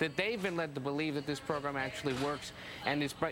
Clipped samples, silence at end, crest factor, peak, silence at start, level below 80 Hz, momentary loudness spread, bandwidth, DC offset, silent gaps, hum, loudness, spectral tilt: under 0.1%; 0 s; 20 dB; -16 dBFS; 0 s; -64 dBFS; 4 LU; 17 kHz; under 0.1%; none; none; -36 LUFS; -5 dB/octave